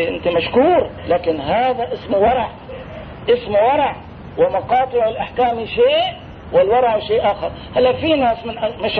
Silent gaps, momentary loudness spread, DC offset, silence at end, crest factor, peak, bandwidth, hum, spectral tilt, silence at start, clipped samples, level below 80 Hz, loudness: none; 11 LU; under 0.1%; 0 s; 14 dB; -4 dBFS; 4.9 kHz; none; -8 dB/octave; 0 s; under 0.1%; -42 dBFS; -17 LUFS